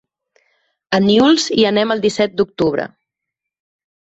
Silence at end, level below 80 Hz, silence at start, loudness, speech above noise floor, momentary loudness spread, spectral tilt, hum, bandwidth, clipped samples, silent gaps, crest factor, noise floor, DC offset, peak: 1.2 s; -54 dBFS; 0.9 s; -15 LUFS; 67 dB; 8 LU; -4.5 dB/octave; none; 8.2 kHz; under 0.1%; none; 16 dB; -82 dBFS; under 0.1%; -2 dBFS